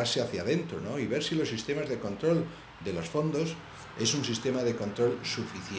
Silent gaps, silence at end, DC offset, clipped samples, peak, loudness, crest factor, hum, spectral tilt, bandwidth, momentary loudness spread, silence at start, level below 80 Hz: none; 0 s; under 0.1%; under 0.1%; -16 dBFS; -31 LUFS; 16 dB; none; -4.5 dB/octave; 10 kHz; 7 LU; 0 s; -62 dBFS